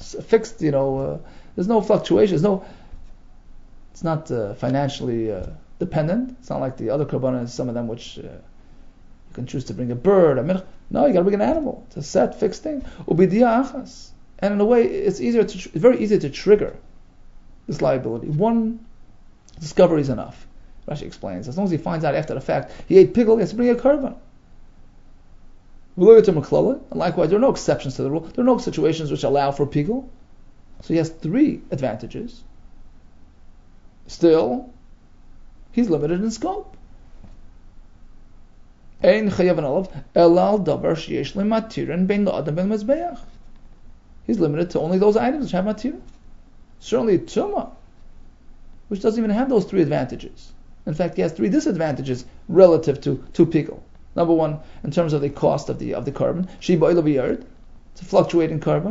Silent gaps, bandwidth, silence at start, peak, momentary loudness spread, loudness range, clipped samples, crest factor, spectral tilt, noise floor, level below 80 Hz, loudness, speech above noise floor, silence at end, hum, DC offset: none; 7.8 kHz; 0 s; 0 dBFS; 14 LU; 7 LU; under 0.1%; 20 dB; -7.5 dB/octave; -45 dBFS; -42 dBFS; -20 LUFS; 26 dB; 0 s; none; under 0.1%